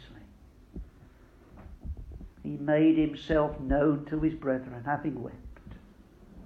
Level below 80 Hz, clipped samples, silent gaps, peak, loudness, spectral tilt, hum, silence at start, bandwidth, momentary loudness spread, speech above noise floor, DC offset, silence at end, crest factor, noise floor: -46 dBFS; under 0.1%; none; -12 dBFS; -29 LUFS; -9 dB/octave; none; 0 s; 4.9 kHz; 24 LU; 27 dB; under 0.1%; 0 s; 18 dB; -55 dBFS